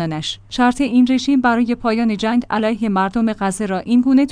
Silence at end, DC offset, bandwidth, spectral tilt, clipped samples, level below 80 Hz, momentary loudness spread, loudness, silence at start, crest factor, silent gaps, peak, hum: 0 s; under 0.1%; 10.5 kHz; -5.5 dB/octave; under 0.1%; -44 dBFS; 7 LU; -17 LUFS; 0 s; 12 dB; none; -4 dBFS; none